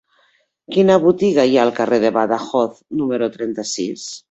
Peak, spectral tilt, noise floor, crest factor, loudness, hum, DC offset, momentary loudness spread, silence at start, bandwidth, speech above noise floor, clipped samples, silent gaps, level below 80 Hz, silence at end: -2 dBFS; -5 dB/octave; -60 dBFS; 16 dB; -17 LUFS; none; under 0.1%; 10 LU; 0.7 s; 8.2 kHz; 44 dB; under 0.1%; none; -60 dBFS; 0.1 s